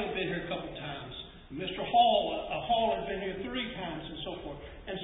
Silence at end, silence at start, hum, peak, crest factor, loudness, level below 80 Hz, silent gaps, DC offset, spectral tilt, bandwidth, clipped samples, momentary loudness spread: 0 s; 0 s; none; -14 dBFS; 18 dB; -32 LUFS; -54 dBFS; none; under 0.1%; -1.5 dB/octave; 3.9 kHz; under 0.1%; 17 LU